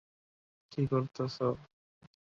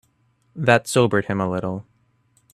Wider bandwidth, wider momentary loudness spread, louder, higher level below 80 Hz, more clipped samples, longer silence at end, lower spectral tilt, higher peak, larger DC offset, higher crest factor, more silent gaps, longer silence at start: second, 7.2 kHz vs 13.5 kHz; second, 11 LU vs 15 LU; second, -35 LUFS vs -20 LUFS; second, -66 dBFS vs -58 dBFS; neither; about the same, 0.6 s vs 0.7 s; first, -8 dB/octave vs -5.5 dB/octave; second, -16 dBFS vs 0 dBFS; neither; about the same, 20 dB vs 22 dB; neither; first, 0.7 s vs 0.55 s